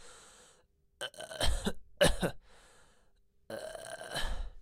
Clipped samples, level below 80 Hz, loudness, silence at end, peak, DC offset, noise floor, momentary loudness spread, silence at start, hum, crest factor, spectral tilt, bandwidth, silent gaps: under 0.1%; -42 dBFS; -36 LUFS; 0 s; -14 dBFS; under 0.1%; -68 dBFS; 24 LU; 0 s; none; 22 dB; -3.5 dB/octave; 16 kHz; none